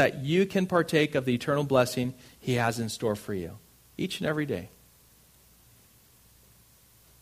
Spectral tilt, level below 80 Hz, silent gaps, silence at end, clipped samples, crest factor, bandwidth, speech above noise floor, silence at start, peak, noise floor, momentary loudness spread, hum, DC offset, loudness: -5.5 dB/octave; -60 dBFS; none; 2.55 s; under 0.1%; 22 dB; 15.5 kHz; 32 dB; 0 s; -8 dBFS; -59 dBFS; 12 LU; none; under 0.1%; -28 LUFS